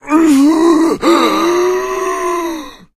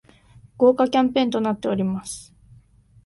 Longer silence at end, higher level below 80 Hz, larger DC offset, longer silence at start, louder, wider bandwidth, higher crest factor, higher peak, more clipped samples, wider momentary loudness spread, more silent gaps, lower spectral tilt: second, 0.25 s vs 0.85 s; first, -44 dBFS vs -58 dBFS; neither; second, 0.05 s vs 0.6 s; first, -12 LUFS vs -21 LUFS; first, 15.5 kHz vs 11.5 kHz; second, 12 dB vs 18 dB; first, 0 dBFS vs -6 dBFS; neither; second, 9 LU vs 14 LU; neither; second, -3.5 dB/octave vs -5.5 dB/octave